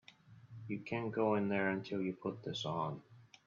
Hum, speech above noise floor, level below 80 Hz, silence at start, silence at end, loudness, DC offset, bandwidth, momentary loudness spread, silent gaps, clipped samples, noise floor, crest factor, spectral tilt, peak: none; 23 dB; -78 dBFS; 0.3 s; 0.2 s; -38 LUFS; under 0.1%; 7.4 kHz; 13 LU; none; under 0.1%; -60 dBFS; 20 dB; -4.5 dB/octave; -20 dBFS